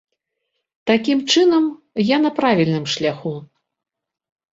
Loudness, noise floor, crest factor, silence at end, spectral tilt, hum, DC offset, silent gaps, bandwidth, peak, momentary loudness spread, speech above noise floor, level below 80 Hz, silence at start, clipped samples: -18 LUFS; -76 dBFS; 18 dB; 1.05 s; -5 dB/octave; none; under 0.1%; none; 7.8 kHz; -2 dBFS; 13 LU; 59 dB; -62 dBFS; 0.85 s; under 0.1%